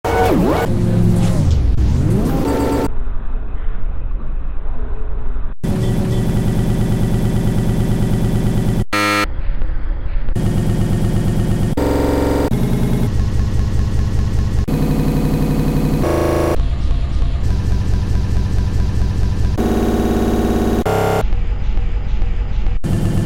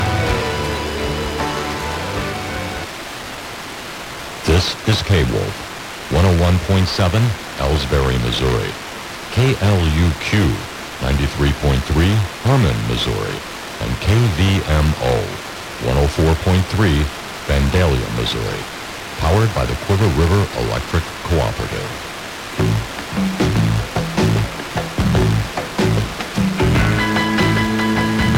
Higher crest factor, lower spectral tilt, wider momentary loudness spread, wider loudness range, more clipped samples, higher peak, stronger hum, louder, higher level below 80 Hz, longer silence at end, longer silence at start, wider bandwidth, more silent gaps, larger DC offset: about the same, 12 dB vs 14 dB; first, -7 dB/octave vs -5.5 dB/octave; about the same, 11 LU vs 12 LU; about the same, 4 LU vs 3 LU; neither; about the same, -2 dBFS vs -4 dBFS; neither; about the same, -18 LUFS vs -18 LUFS; first, -20 dBFS vs -26 dBFS; about the same, 0 s vs 0 s; about the same, 0.05 s vs 0 s; about the same, 16 kHz vs 17 kHz; neither; first, 1% vs under 0.1%